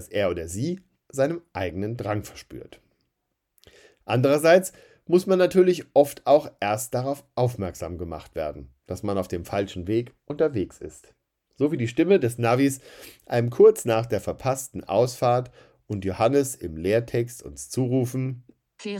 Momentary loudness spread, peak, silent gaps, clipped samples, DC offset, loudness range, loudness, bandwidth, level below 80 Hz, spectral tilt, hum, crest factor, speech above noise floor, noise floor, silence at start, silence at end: 17 LU; -4 dBFS; none; under 0.1%; under 0.1%; 8 LU; -24 LUFS; 18 kHz; -56 dBFS; -6 dB/octave; none; 20 dB; 55 dB; -79 dBFS; 0 s; 0 s